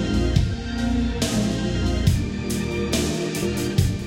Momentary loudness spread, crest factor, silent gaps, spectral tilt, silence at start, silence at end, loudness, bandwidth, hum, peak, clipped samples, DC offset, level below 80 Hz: 4 LU; 16 dB; none; -5.5 dB/octave; 0 s; 0 s; -23 LUFS; 17 kHz; none; -6 dBFS; under 0.1%; under 0.1%; -30 dBFS